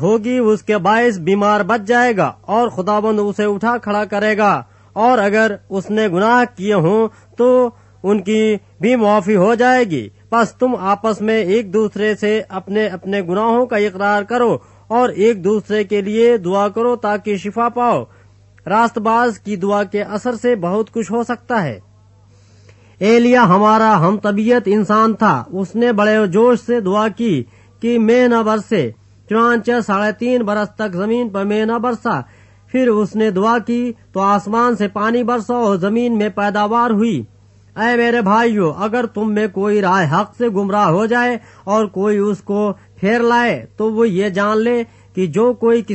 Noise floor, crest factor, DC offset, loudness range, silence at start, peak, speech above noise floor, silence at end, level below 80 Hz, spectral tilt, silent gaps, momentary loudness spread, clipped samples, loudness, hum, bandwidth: -47 dBFS; 16 dB; under 0.1%; 3 LU; 0 s; 0 dBFS; 32 dB; 0 s; -56 dBFS; -6.5 dB/octave; none; 7 LU; under 0.1%; -16 LUFS; none; 8.4 kHz